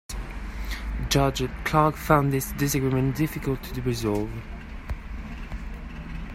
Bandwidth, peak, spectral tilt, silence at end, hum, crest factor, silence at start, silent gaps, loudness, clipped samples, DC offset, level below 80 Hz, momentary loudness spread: 16 kHz; -4 dBFS; -5.5 dB/octave; 0 s; none; 22 dB; 0.1 s; none; -26 LUFS; under 0.1%; under 0.1%; -36 dBFS; 16 LU